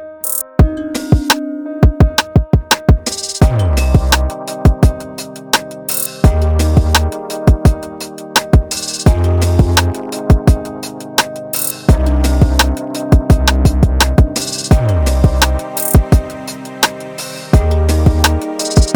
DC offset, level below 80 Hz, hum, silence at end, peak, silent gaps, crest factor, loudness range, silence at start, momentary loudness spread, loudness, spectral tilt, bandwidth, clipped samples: under 0.1%; -16 dBFS; none; 0 s; 0 dBFS; none; 12 dB; 2 LU; 0 s; 9 LU; -14 LUFS; -5 dB/octave; 19.5 kHz; under 0.1%